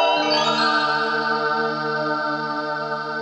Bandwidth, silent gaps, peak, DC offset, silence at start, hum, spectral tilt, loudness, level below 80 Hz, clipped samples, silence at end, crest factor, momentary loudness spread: 9.2 kHz; none; -6 dBFS; under 0.1%; 0 s; none; -3.5 dB/octave; -21 LUFS; -76 dBFS; under 0.1%; 0 s; 14 dB; 7 LU